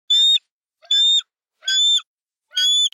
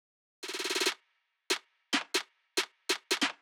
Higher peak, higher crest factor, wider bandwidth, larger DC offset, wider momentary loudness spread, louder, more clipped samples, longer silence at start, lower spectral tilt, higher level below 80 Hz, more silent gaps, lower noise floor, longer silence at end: first, -8 dBFS vs -16 dBFS; second, 10 dB vs 20 dB; second, 15.5 kHz vs 19.5 kHz; neither; about the same, 7 LU vs 8 LU; first, -15 LUFS vs -32 LUFS; neither; second, 0.1 s vs 0.4 s; second, 12 dB/octave vs 0.5 dB/octave; about the same, under -90 dBFS vs under -90 dBFS; first, 0.51-0.61 s, 2.07-2.18 s vs none; second, -57 dBFS vs -77 dBFS; about the same, 0.05 s vs 0.05 s